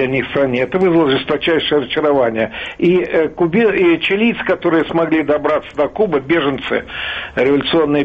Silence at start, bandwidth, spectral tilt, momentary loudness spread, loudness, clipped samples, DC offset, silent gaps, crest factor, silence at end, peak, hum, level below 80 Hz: 0 s; 5.6 kHz; -7.5 dB/octave; 7 LU; -15 LUFS; under 0.1%; under 0.1%; none; 12 dB; 0 s; -4 dBFS; none; -46 dBFS